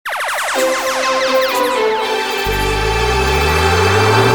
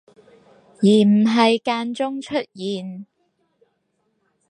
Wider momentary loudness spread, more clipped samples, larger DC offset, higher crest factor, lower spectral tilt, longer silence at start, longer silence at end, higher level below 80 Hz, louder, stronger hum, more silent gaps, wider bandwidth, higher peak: second, 5 LU vs 14 LU; neither; neither; about the same, 14 dB vs 18 dB; second, -4 dB/octave vs -6 dB/octave; second, 0.05 s vs 0.8 s; second, 0 s vs 1.45 s; first, -28 dBFS vs -70 dBFS; first, -14 LUFS vs -19 LUFS; neither; neither; first, over 20 kHz vs 9.8 kHz; about the same, -2 dBFS vs -4 dBFS